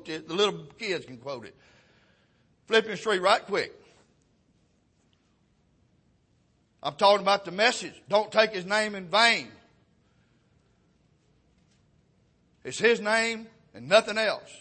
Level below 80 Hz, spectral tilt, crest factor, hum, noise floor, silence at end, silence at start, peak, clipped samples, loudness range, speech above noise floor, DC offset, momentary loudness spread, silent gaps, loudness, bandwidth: -72 dBFS; -2.5 dB/octave; 22 dB; none; -67 dBFS; 0.05 s; 0.05 s; -8 dBFS; under 0.1%; 8 LU; 42 dB; under 0.1%; 16 LU; none; -25 LUFS; 8.8 kHz